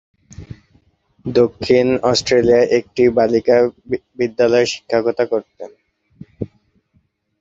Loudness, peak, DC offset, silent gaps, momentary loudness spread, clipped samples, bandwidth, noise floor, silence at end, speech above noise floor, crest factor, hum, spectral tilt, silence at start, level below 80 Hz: -16 LUFS; 0 dBFS; under 0.1%; none; 18 LU; under 0.1%; 7.8 kHz; -62 dBFS; 0.95 s; 46 dB; 16 dB; none; -5 dB/octave; 0.4 s; -48 dBFS